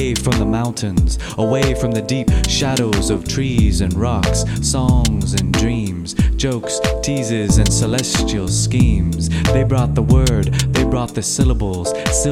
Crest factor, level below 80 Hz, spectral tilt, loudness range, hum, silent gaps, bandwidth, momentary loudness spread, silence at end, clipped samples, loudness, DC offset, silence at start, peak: 14 dB; -22 dBFS; -5 dB/octave; 2 LU; none; none; 15.5 kHz; 5 LU; 0 s; under 0.1%; -17 LUFS; under 0.1%; 0 s; -2 dBFS